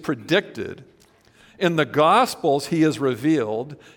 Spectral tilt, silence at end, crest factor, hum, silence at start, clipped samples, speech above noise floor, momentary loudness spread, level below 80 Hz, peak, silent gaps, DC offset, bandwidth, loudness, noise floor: -5.5 dB/octave; 0.2 s; 18 dB; none; 0 s; under 0.1%; 34 dB; 14 LU; -64 dBFS; -4 dBFS; none; under 0.1%; 18 kHz; -21 LUFS; -55 dBFS